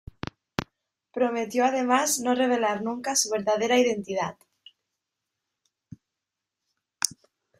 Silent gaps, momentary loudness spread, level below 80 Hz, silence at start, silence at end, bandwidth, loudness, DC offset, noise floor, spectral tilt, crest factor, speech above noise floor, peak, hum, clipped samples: none; 13 LU; -60 dBFS; 0.6 s; 0.5 s; 15.5 kHz; -25 LUFS; under 0.1%; -86 dBFS; -2.5 dB/octave; 28 dB; 62 dB; 0 dBFS; none; under 0.1%